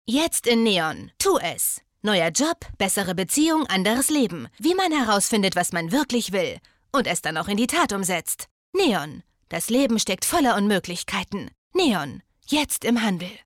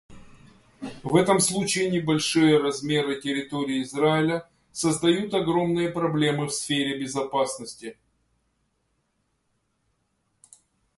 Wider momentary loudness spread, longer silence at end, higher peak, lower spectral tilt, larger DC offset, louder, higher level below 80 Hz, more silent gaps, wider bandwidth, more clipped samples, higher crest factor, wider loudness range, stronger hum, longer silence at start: second, 8 LU vs 14 LU; second, 0.05 s vs 3.05 s; second, -12 dBFS vs -6 dBFS; second, -3 dB/octave vs -4.5 dB/octave; neither; about the same, -22 LUFS vs -24 LUFS; first, -52 dBFS vs -60 dBFS; first, 8.51-8.73 s, 11.58-11.71 s vs none; first, 18 kHz vs 12 kHz; neither; second, 12 dB vs 20 dB; second, 2 LU vs 9 LU; neither; about the same, 0.05 s vs 0.1 s